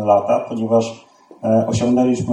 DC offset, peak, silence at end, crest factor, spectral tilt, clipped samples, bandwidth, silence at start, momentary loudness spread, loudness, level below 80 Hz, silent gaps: under 0.1%; -2 dBFS; 0 s; 16 dB; -7 dB/octave; under 0.1%; 10.5 kHz; 0 s; 6 LU; -18 LUFS; -52 dBFS; none